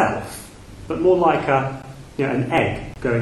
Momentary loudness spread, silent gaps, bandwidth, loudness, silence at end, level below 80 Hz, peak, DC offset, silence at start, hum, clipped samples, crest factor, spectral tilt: 19 LU; none; 12.5 kHz; -20 LUFS; 0 s; -44 dBFS; -2 dBFS; under 0.1%; 0 s; none; under 0.1%; 18 dB; -6.5 dB/octave